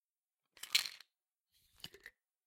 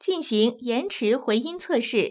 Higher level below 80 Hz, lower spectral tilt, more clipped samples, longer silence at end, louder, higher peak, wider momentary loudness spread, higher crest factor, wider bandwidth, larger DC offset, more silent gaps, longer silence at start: second, -84 dBFS vs -74 dBFS; second, 2 dB/octave vs -9.5 dB/octave; neither; first, 0.35 s vs 0 s; second, -36 LUFS vs -24 LUFS; second, -14 dBFS vs -10 dBFS; first, 24 LU vs 4 LU; first, 32 dB vs 14 dB; first, 16.5 kHz vs 4 kHz; neither; neither; first, 0.65 s vs 0.05 s